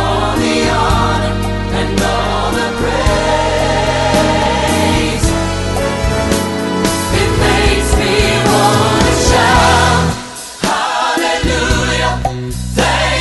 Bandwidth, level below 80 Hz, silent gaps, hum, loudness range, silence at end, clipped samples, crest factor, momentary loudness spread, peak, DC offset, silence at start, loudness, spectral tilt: 12.5 kHz; -22 dBFS; none; none; 3 LU; 0 s; under 0.1%; 12 dB; 6 LU; 0 dBFS; under 0.1%; 0 s; -13 LUFS; -4.5 dB/octave